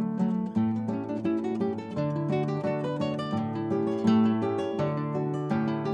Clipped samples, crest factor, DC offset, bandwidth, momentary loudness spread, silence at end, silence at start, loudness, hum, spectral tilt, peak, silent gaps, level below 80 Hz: under 0.1%; 16 dB; under 0.1%; 8.2 kHz; 6 LU; 0 s; 0 s; -28 LUFS; none; -8.5 dB/octave; -12 dBFS; none; -68 dBFS